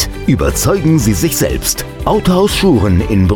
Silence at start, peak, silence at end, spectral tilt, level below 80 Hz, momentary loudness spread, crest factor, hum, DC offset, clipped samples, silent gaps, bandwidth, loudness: 0 s; 0 dBFS; 0 s; -5 dB/octave; -24 dBFS; 5 LU; 12 dB; none; 0.3%; under 0.1%; none; over 20 kHz; -12 LUFS